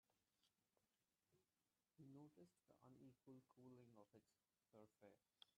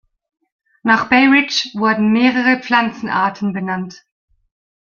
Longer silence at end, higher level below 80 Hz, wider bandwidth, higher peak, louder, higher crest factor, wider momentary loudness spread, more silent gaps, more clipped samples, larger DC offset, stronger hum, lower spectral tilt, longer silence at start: second, 0.05 s vs 1.05 s; second, under -90 dBFS vs -58 dBFS; about the same, 7.2 kHz vs 7.2 kHz; second, -50 dBFS vs -2 dBFS; second, -68 LUFS vs -15 LUFS; first, 22 dB vs 16 dB; second, 3 LU vs 12 LU; neither; neither; neither; neither; first, -6 dB/octave vs -4.5 dB/octave; second, 0.1 s vs 0.85 s